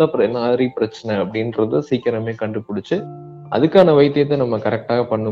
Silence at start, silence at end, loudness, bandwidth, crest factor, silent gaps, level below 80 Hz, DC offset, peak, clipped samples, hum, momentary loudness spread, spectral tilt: 0 s; 0 s; -18 LUFS; 7.4 kHz; 18 dB; none; -58 dBFS; under 0.1%; 0 dBFS; under 0.1%; none; 11 LU; -8 dB/octave